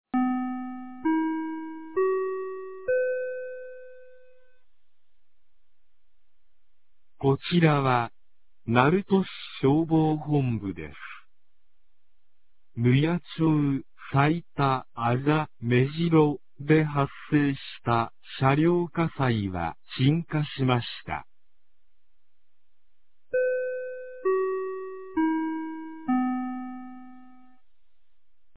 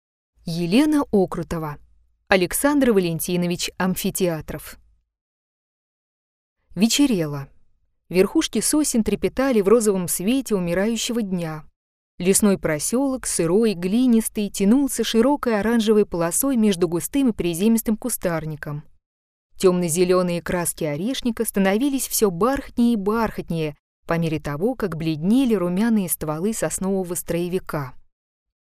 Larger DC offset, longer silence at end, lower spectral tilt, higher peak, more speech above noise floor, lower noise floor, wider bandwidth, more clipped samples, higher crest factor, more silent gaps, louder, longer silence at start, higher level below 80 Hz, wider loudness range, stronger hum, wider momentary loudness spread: first, 0.5% vs under 0.1%; first, 1.35 s vs 0.6 s; first, -11.5 dB/octave vs -4.5 dB/octave; about the same, -4 dBFS vs -2 dBFS; first, 53 dB vs 38 dB; first, -77 dBFS vs -58 dBFS; second, 4 kHz vs 15.5 kHz; neither; about the same, 22 dB vs 20 dB; second, none vs 5.21-6.56 s, 11.76-12.18 s, 19.06-19.50 s, 23.79-24.03 s; second, -26 LUFS vs -21 LUFS; second, 0.05 s vs 0.45 s; second, -56 dBFS vs -46 dBFS; first, 8 LU vs 5 LU; neither; first, 14 LU vs 10 LU